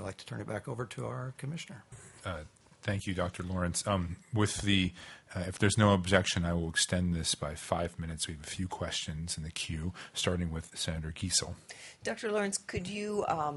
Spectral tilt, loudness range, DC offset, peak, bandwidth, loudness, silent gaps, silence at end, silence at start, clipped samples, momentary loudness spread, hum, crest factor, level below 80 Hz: -4 dB/octave; 7 LU; under 0.1%; -8 dBFS; 11.5 kHz; -33 LUFS; none; 0 s; 0 s; under 0.1%; 13 LU; none; 26 dB; -54 dBFS